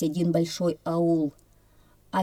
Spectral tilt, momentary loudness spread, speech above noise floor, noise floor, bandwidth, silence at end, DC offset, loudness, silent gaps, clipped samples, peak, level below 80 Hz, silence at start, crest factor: -7 dB/octave; 6 LU; 33 dB; -58 dBFS; 15 kHz; 0 s; under 0.1%; -26 LUFS; none; under 0.1%; -12 dBFS; -62 dBFS; 0 s; 14 dB